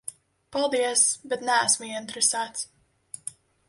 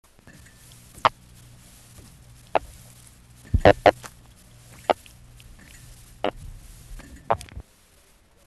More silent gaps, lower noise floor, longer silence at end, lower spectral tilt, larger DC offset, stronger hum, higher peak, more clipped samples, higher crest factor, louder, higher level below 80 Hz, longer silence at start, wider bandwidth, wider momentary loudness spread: neither; second, -47 dBFS vs -57 dBFS; second, 0.4 s vs 0.85 s; second, 0 dB/octave vs -5.5 dB/octave; neither; neither; second, -8 dBFS vs -2 dBFS; neither; second, 20 dB vs 26 dB; about the same, -24 LUFS vs -24 LUFS; second, -72 dBFS vs -42 dBFS; second, 0.05 s vs 1.05 s; second, 11.5 kHz vs 13 kHz; second, 17 LU vs 28 LU